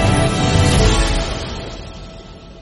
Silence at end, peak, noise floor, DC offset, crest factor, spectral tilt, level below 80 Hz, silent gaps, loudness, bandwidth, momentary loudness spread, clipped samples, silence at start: 0 s; -2 dBFS; -36 dBFS; under 0.1%; 16 dB; -5 dB/octave; -22 dBFS; none; -16 LUFS; 11.5 kHz; 22 LU; under 0.1%; 0 s